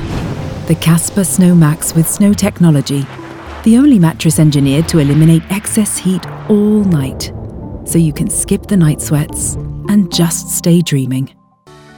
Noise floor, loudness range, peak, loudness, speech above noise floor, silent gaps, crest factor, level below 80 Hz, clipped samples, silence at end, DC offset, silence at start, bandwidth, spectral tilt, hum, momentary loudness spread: -41 dBFS; 3 LU; 0 dBFS; -12 LUFS; 30 dB; none; 12 dB; -34 dBFS; under 0.1%; 0.7 s; under 0.1%; 0 s; 19 kHz; -5.5 dB/octave; none; 12 LU